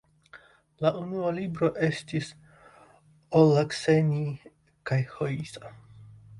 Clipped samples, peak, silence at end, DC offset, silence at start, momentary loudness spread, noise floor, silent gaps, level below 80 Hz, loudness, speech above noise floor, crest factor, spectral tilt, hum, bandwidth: under 0.1%; -8 dBFS; 0 s; under 0.1%; 0.35 s; 19 LU; -58 dBFS; none; -62 dBFS; -27 LUFS; 32 dB; 20 dB; -7 dB/octave; none; 11.5 kHz